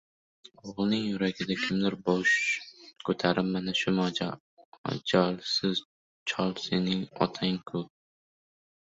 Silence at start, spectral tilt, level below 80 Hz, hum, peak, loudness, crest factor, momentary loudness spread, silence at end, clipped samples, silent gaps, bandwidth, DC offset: 0.65 s; -5 dB/octave; -64 dBFS; none; -10 dBFS; -29 LUFS; 22 dB; 11 LU; 1.05 s; under 0.1%; 4.40-4.57 s, 4.65-4.72 s, 4.78-4.84 s, 5.85-6.26 s; 8 kHz; under 0.1%